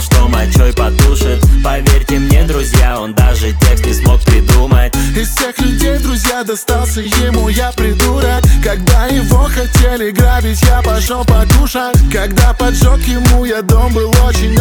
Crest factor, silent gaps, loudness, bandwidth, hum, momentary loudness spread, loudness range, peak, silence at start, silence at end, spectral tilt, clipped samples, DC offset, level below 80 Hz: 10 dB; none; -11 LUFS; 19 kHz; none; 4 LU; 2 LU; 0 dBFS; 0 s; 0 s; -5 dB/octave; 0.3%; under 0.1%; -12 dBFS